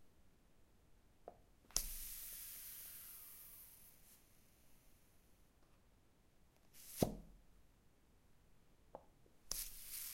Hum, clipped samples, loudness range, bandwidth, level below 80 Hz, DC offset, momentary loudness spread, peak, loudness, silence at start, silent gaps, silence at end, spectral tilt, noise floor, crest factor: none; under 0.1%; 13 LU; 16.5 kHz; -64 dBFS; under 0.1%; 21 LU; -14 dBFS; -47 LUFS; 0 s; none; 0 s; -3.5 dB/octave; -71 dBFS; 38 dB